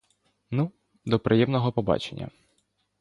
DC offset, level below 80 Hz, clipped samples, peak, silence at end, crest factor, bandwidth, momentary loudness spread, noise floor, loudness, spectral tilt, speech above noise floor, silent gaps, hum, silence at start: under 0.1%; -54 dBFS; under 0.1%; -6 dBFS; 0.7 s; 20 dB; 11 kHz; 17 LU; -72 dBFS; -26 LUFS; -8 dB/octave; 47 dB; none; none; 0.5 s